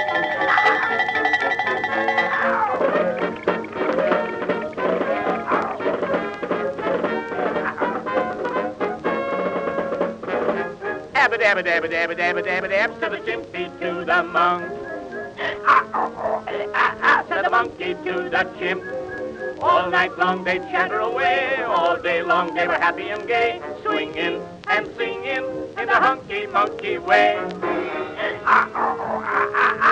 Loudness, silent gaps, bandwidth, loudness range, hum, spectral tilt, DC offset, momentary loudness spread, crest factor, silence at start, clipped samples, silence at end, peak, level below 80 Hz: -21 LUFS; none; 9.4 kHz; 4 LU; none; -5 dB/octave; under 0.1%; 9 LU; 18 dB; 0 s; under 0.1%; 0 s; -2 dBFS; -58 dBFS